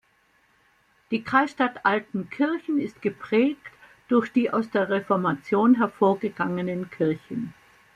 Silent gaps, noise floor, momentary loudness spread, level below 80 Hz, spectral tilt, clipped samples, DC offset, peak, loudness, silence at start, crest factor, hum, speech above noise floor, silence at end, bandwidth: none; -64 dBFS; 10 LU; -66 dBFS; -7.5 dB/octave; under 0.1%; under 0.1%; -6 dBFS; -24 LUFS; 1.1 s; 20 dB; none; 40 dB; 0.45 s; 9.4 kHz